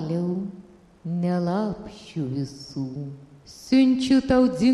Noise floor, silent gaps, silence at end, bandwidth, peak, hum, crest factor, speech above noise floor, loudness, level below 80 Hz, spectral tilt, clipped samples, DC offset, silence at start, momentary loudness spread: -48 dBFS; none; 0 s; 11 kHz; -8 dBFS; none; 16 dB; 25 dB; -24 LUFS; -52 dBFS; -7 dB/octave; under 0.1%; under 0.1%; 0 s; 18 LU